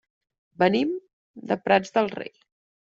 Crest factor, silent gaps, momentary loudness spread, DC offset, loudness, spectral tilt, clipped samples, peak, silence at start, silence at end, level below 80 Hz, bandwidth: 22 dB; 1.13-1.34 s; 16 LU; under 0.1%; -24 LUFS; -6 dB/octave; under 0.1%; -6 dBFS; 0.6 s; 0.7 s; -68 dBFS; 7.8 kHz